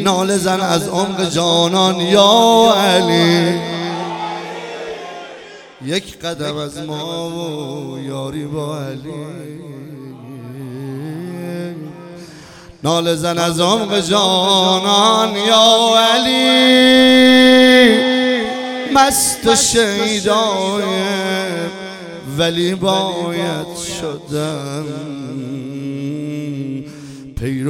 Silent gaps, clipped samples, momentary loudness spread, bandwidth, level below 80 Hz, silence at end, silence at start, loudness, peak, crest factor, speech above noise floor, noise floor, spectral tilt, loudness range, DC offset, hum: none; under 0.1%; 20 LU; 17.5 kHz; -48 dBFS; 0 s; 0 s; -14 LUFS; 0 dBFS; 16 dB; 24 dB; -38 dBFS; -3.5 dB/octave; 17 LU; under 0.1%; none